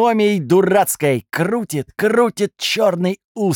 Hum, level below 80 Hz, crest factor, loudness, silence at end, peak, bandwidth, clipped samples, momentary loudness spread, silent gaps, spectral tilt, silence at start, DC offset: none; -62 dBFS; 14 dB; -17 LUFS; 0 s; -2 dBFS; 18.5 kHz; under 0.1%; 7 LU; 3.24-3.35 s; -5 dB/octave; 0 s; under 0.1%